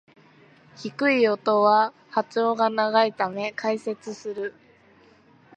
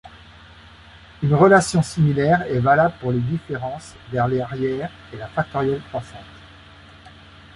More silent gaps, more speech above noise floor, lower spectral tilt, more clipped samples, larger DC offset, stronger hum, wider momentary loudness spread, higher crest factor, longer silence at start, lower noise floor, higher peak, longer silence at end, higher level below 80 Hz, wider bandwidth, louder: neither; first, 32 dB vs 25 dB; second, -5 dB/octave vs -6.5 dB/octave; neither; neither; neither; second, 14 LU vs 17 LU; about the same, 20 dB vs 18 dB; first, 0.8 s vs 0.05 s; first, -56 dBFS vs -45 dBFS; second, -6 dBFS vs -2 dBFS; second, 1.05 s vs 1.2 s; second, -76 dBFS vs -48 dBFS; second, 9 kHz vs 11.5 kHz; second, -23 LUFS vs -20 LUFS